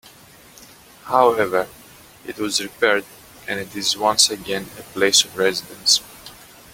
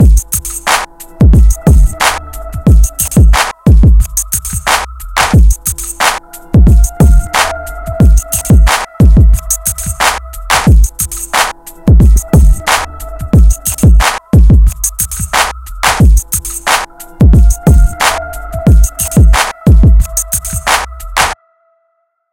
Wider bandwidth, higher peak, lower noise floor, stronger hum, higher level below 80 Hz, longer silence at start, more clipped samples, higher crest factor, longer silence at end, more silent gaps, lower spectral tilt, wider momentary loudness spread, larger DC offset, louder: about the same, 17 kHz vs 17.5 kHz; about the same, 0 dBFS vs 0 dBFS; second, -47 dBFS vs -61 dBFS; neither; second, -58 dBFS vs -10 dBFS; first, 1.05 s vs 0 s; second, under 0.1% vs 0.3%; first, 22 dB vs 8 dB; second, 0.4 s vs 1 s; neither; second, -1 dB/octave vs -4.5 dB/octave; first, 20 LU vs 8 LU; neither; second, -19 LUFS vs -10 LUFS